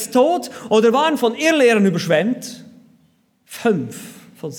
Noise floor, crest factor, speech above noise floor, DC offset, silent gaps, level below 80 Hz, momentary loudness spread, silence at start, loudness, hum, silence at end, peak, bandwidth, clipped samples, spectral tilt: -59 dBFS; 16 dB; 42 dB; under 0.1%; none; -70 dBFS; 19 LU; 0 s; -17 LUFS; none; 0 s; -4 dBFS; 19 kHz; under 0.1%; -5 dB/octave